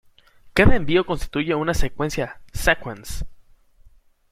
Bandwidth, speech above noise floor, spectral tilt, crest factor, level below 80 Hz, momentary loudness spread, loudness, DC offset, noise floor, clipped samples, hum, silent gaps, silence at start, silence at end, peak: 15.5 kHz; 33 dB; -5.5 dB/octave; 20 dB; -30 dBFS; 16 LU; -22 LUFS; under 0.1%; -52 dBFS; under 0.1%; none; none; 0.45 s; 1 s; -2 dBFS